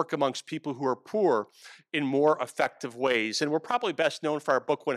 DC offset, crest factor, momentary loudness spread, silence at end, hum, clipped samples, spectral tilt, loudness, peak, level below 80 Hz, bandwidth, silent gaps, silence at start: under 0.1%; 18 dB; 6 LU; 0 s; none; under 0.1%; -4.5 dB/octave; -28 LUFS; -10 dBFS; -82 dBFS; 14 kHz; none; 0 s